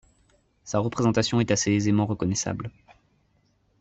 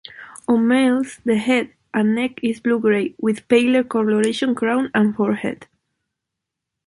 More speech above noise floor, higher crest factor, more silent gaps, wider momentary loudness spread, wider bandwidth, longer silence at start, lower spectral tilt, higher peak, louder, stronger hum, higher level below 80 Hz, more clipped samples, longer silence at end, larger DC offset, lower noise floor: second, 42 dB vs 64 dB; about the same, 16 dB vs 16 dB; neither; about the same, 8 LU vs 8 LU; second, 8.4 kHz vs 11.5 kHz; first, 0.65 s vs 0.1 s; about the same, -5 dB/octave vs -5.5 dB/octave; second, -10 dBFS vs -4 dBFS; second, -25 LUFS vs -19 LUFS; neither; first, -56 dBFS vs -62 dBFS; neither; about the same, 1.1 s vs 1.2 s; neither; second, -67 dBFS vs -82 dBFS